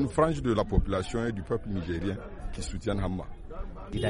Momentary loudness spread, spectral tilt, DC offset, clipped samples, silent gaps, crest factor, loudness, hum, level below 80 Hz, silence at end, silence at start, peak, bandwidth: 15 LU; -6.5 dB/octave; under 0.1%; under 0.1%; none; 20 dB; -31 LUFS; none; -36 dBFS; 0 s; 0 s; -10 dBFS; 11 kHz